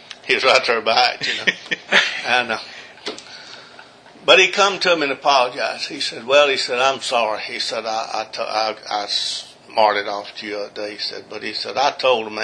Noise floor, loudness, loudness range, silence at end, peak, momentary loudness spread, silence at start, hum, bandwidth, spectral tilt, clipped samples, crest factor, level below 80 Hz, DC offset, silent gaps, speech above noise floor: -44 dBFS; -18 LUFS; 6 LU; 0 s; 0 dBFS; 14 LU; 0.1 s; none; 10.5 kHz; -1.5 dB/octave; under 0.1%; 20 dB; -68 dBFS; under 0.1%; none; 24 dB